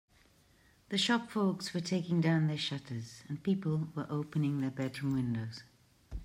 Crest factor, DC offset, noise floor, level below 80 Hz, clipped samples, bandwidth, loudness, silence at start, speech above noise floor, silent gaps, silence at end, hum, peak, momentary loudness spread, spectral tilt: 18 dB; under 0.1%; -66 dBFS; -58 dBFS; under 0.1%; 15 kHz; -34 LUFS; 0.9 s; 32 dB; none; 0 s; none; -18 dBFS; 13 LU; -6 dB/octave